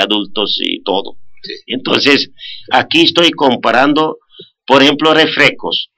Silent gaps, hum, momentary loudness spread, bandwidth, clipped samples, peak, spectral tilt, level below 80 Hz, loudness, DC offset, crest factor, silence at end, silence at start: none; none; 13 LU; 14 kHz; 0.2%; 0 dBFS; -4 dB/octave; -56 dBFS; -11 LUFS; under 0.1%; 12 dB; 0.15 s; 0 s